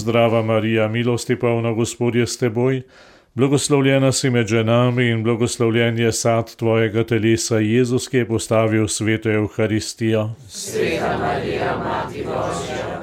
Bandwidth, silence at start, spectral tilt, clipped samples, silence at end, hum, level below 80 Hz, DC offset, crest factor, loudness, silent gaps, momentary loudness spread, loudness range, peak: 15.5 kHz; 0 s; -5.5 dB/octave; under 0.1%; 0 s; none; -48 dBFS; under 0.1%; 16 dB; -19 LUFS; none; 7 LU; 4 LU; -4 dBFS